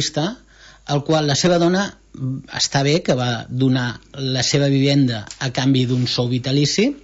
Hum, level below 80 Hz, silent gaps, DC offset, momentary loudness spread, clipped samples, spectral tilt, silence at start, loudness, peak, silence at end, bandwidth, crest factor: none; -50 dBFS; none; under 0.1%; 11 LU; under 0.1%; -5 dB/octave; 0 s; -19 LUFS; -4 dBFS; 0.05 s; 8 kHz; 16 dB